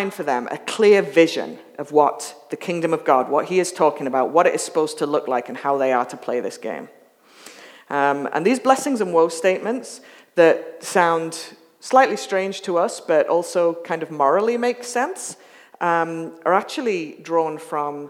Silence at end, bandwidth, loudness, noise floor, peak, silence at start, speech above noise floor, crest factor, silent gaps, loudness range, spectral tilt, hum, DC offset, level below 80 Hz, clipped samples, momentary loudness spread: 0 s; 15.5 kHz; -20 LUFS; -47 dBFS; 0 dBFS; 0 s; 27 dB; 20 dB; none; 4 LU; -4 dB/octave; none; under 0.1%; -84 dBFS; under 0.1%; 13 LU